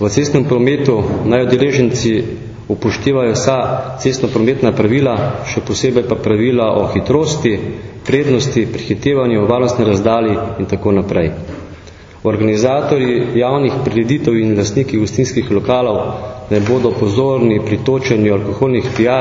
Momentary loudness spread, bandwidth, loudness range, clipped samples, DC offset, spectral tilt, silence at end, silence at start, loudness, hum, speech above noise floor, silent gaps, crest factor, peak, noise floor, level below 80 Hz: 6 LU; 7.6 kHz; 1 LU; under 0.1%; under 0.1%; -6.5 dB/octave; 0 s; 0 s; -14 LUFS; none; 22 dB; none; 14 dB; 0 dBFS; -35 dBFS; -40 dBFS